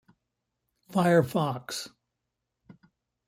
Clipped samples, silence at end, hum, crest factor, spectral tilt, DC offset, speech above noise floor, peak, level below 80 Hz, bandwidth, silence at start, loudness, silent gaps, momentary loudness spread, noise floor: under 0.1%; 1.4 s; none; 22 dB; -6 dB/octave; under 0.1%; 58 dB; -10 dBFS; -70 dBFS; 16 kHz; 0.9 s; -27 LUFS; none; 14 LU; -84 dBFS